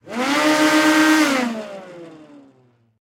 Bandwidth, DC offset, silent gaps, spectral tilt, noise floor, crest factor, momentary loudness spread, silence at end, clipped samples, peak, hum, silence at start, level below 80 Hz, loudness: 16.5 kHz; under 0.1%; none; -2.5 dB/octave; -56 dBFS; 16 dB; 18 LU; 0.9 s; under 0.1%; -4 dBFS; none; 0.05 s; -68 dBFS; -16 LUFS